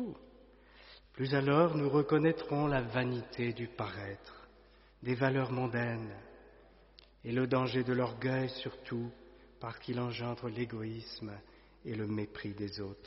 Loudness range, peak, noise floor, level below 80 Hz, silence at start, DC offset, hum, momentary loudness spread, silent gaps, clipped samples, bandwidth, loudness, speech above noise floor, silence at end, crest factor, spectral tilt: 8 LU; -14 dBFS; -61 dBFS; -62 dBFS; 0 s; under 0.1%; none; 18 LU; none; under 0.1%; 5.8 kHz; -35 LUFS; 27 dB; 0 s; 20 dB; -5.5 dB/octave